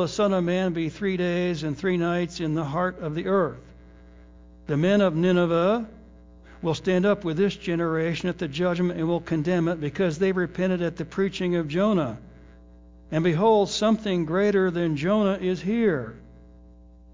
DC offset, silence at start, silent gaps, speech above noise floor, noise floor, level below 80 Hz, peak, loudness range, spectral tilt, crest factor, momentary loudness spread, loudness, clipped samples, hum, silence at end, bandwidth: under 0.1%; 0 s; none; 26 dB; -49 dBFS; -52 dBFS; -10 dBFS; 3 LU; -6.5 dB/octave; 16 dB; 8 LU; -24 LUFS; under 0.1%; none; 0.8 s; 7.6 kHz